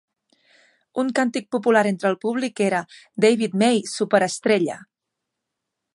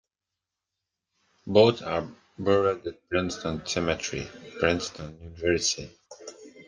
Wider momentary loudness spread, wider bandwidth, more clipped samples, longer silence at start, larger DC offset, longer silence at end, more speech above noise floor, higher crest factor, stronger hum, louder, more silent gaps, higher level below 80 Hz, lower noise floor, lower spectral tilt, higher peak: second, 8 LU vs 22 LU; first, 11.5 kHz vs 10 kHz; neither; second, 0.95 s vs 1.45 s; neither; first, 1.15 s vs 0.05 s; about the same, 61 dB vs 61 dB; about the same, 20 dB vs 24 dB; neither; first, -21 LUFS vs -26 LUFS; neither; second, -74 dBFS vs -56 dBFS; second, -82 dBFS vs -88 dBFS; about the same, -4.5 dB/octave vs -4 dB/octave; about the same, -2 dBFS vs -4 dBFS